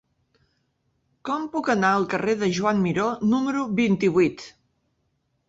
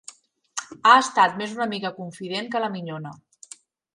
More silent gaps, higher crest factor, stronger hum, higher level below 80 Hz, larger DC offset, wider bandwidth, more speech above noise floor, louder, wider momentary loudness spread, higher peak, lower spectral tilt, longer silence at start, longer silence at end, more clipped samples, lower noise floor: neither; about the same, 18 dB vs 22 dB; neither; first, -62 dBFS vs -74 dBFS; neither; second, 8 kHz vs 11.5 kHz; first, 50 dB vs 27 dB; about the same, -23 LUFS vs -22 LUFS; second, 9 LU vs 19 LU; second, -8 dBFS vs -2 dBFS; first, -6 dB/octave vs -3 dB/octave; first, 1.25 s vs 0.55 s; first, 1 s vs 0.8 s; neither; first, -72 dBFS vs -49 dBFS